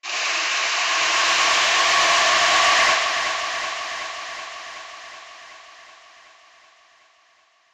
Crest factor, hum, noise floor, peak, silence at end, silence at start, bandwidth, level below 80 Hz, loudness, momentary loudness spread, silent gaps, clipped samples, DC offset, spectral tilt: 16 dB; none; -59 dBFS; -6 dBFS; 1.9 s; 0.05 s; 16 kHz; -60 dBFS; -18 LUFS; 21 LU; none; under 0.1%; under 0.1%; 1.5 dB/octave